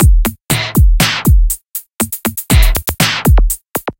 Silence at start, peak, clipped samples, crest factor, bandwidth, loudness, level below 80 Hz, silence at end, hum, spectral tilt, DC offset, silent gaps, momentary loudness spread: 0 s; 0 dBFS; under 0.1%; 12 dB; 17.5 kHz; -13 LUFS; -14 dBFS; 0.1 s; none; -4 dB/octave; under 0.1%; none; 8 LU